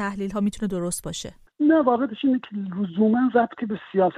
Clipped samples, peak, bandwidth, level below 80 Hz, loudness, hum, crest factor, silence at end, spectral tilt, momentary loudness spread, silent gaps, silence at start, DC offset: under 0.1%; -6 dBFS; 15 kHz; -52 dBFS; -23 LUFS; none; 16 dB; 0 s; -6 dB/octave; 12 LU; none; 0 s; under 0.1%